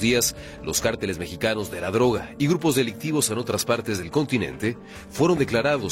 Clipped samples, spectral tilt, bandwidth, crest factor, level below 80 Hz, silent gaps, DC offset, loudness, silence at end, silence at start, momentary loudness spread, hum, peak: under 0.1%; -4 dB/octave; 16.5 kHz; 16 dB; -48 dBFS; none; under 0.1%; -24 LUFS; 0 s; 0 s; 8 LU; none; -8 dBFS